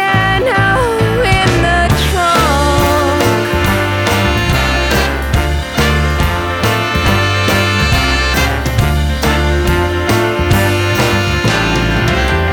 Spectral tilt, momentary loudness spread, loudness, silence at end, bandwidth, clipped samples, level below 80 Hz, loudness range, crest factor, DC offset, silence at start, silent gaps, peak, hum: -5 dB/octave; 3 LU; -12 LUFS; 0 s; 19 kHz; under 0.1%; -20 dBFS; 2 LU; 12 dB; under 0.1%; 0 s; none; 0 dBFS; none